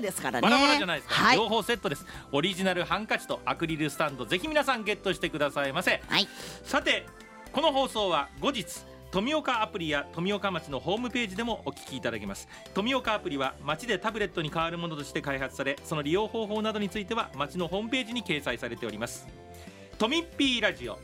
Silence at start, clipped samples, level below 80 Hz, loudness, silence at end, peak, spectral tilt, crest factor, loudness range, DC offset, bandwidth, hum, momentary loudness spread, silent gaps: 0 s; under 0.1%; -54 dBFS; -29 LUFS; 0 s; -8 dBFS; -4 dB/octave; 22 dB; 4 LU; under 0.1%; 16 kHz; none; 10 LU; none